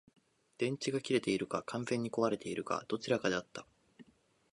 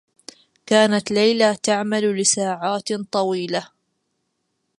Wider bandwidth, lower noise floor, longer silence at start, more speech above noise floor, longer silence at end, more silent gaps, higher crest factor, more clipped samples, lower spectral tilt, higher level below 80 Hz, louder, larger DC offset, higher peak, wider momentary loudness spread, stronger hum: about the same, 11.5 kHz vs 11.5 kHz; about the same, -70 dBFS vs -73 dBFS; about the same, 0.6 s vs 0.65 s; second, 34 dB vs 54 dB; second, 0.5 s vs 1.15 s; neither; about the same, 20 dB vs 20 dB; neither; first, -5 dB/octave vs -3 dB/octave; second, -74 dBFS vs -68 dBFS; second, -36 LUFS vs -19 LUFS; neither; second, -16 dBFS vs -2 dBFS; about the same, 6 LU vs 8 LU; neither